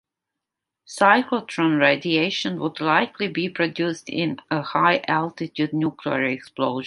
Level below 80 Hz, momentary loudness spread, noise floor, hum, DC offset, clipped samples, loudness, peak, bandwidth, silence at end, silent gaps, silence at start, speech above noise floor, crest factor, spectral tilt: -68 dBFS; 8 LU; -85 dBFS; none; under 0.1%; under 0.1%; -22 LUFS; -2 dBFS; 11.5 kHz; 0 s; none; 0.9 s; 63 dB; 20 dB; -5.5 dB/octave